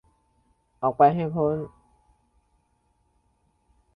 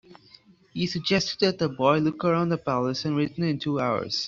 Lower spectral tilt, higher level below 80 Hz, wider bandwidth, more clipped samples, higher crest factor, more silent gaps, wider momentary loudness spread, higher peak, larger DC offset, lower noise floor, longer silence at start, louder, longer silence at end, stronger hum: first, -10.5 dB/octave vs -5.5 dB/octave; about the same, -60 dBFS vs -60 dBFS; second, 4.9 kHz vs 7.6 kHz; neither; about the same, 22 dB vs 20 dB; neither; first, 12 LU vs 5 LU; about the same, -6 dBFS vs -6 dBFS; neither; first, -69 dBFS vs -55 dBFS; first, 0.8 s vs 0.1 s; about the same, -23 LUFS vs -25 LUFS; first, 2.3 s vs 0 s; neither